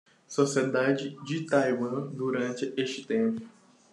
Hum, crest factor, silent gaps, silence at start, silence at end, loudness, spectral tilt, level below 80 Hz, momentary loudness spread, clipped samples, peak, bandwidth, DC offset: none; 20 dB; none; 0.3 s; 0.45 s; -29 LUFS; -5.5 dB/octave; -78 dBFS; 8 LU; under 0.1%; -10 dBFS; 11.5 kHz; under 0.1%